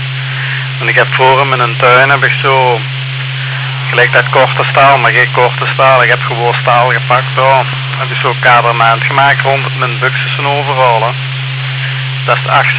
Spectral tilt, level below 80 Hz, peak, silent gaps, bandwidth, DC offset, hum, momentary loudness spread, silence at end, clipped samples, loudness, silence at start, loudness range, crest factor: -8.5 dB/octave; -48 dBFS; 0 dBFS; none; 4 kHz; under 0.1%; none; 9 LU; 0 s; 0.3%; -9 LUFS; 0 s; 2 LU; 10 dB